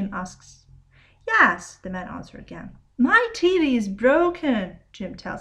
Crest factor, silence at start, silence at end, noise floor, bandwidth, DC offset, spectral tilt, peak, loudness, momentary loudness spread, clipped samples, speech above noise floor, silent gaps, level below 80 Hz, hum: 20 dB; 0 s; 0 s; -54 dBFS; 10.5 kHz; under 0.1%; -5 dB/octave; -2 dBFS; -20 LUFS; 21 LU; under 0.1%; 31 dB; none; -52 dBFS; none